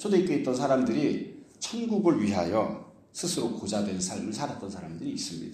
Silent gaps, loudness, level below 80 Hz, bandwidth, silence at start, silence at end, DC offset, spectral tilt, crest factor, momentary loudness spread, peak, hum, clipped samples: none; -29 LUFS; -64 dBFS; 15 kHz; 0 s; 0 s; under 0.1%; -5 dB/octave; 18 dB; 12 LU; -10 dBFS; none; under 0.1%